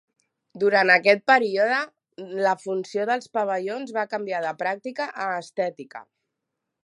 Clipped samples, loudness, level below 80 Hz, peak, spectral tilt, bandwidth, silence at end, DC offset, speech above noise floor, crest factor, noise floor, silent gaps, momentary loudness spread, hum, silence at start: under 0.1%; -23 LUFS; -82 dBFS; -2 dBFS; -4.5 dB/octave; 11.5 kHz; 0.8 s; under 0.1%; 59 dB; 22 dB; -82 dBFS; none; 15 LU; none; 0.55 s